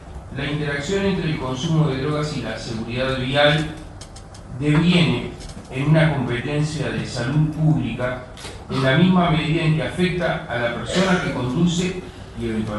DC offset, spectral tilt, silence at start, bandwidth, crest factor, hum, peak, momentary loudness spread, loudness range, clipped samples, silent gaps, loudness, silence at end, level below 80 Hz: under 0.1%; -6 dB/octave; 0 s; 11.5 kHz; 18 dB; none; -4 dBFS; 15 LU; 2 LU; under 0.1%; none; -21 LUFS; 0 s; -40 dBFS